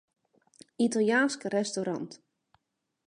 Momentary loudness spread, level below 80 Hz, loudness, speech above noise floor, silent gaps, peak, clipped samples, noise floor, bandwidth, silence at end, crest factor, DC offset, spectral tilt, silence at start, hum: 11 LU; -80 dBFS; -29 LUFS; 51 dB; none; -14 dBFS; under 0.1%; -79 dBFS; 11 kHz; 0.9 s; 18 dB; under 0.1%; -4 dB/octave; 0.8 s; none